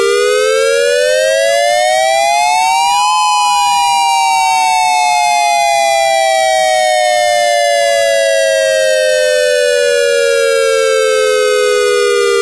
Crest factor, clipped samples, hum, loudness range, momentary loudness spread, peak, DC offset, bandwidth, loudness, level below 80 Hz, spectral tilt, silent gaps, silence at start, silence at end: 6 dB; under 0.1%; none; 0 LU; 1 LU; -4 dBFS; 0.4%; 11 kHz; -10 LUFS; -54 dBFS; 1 dB/octave; none; 0 s; 0 s